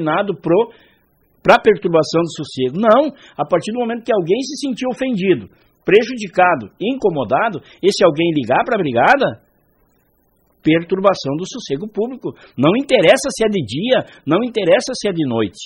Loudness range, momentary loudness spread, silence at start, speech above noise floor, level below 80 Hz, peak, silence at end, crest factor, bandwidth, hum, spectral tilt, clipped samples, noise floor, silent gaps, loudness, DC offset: 2 LU; 10 LU; 0 s; 43 dB; -54 dBFS; 0 dBFS; 0 s; 16 dB; 12.5 kHz; none; -5 dB/octave; under 0.1%; -59 dBFS; none; -16 LUFS; under 0.1%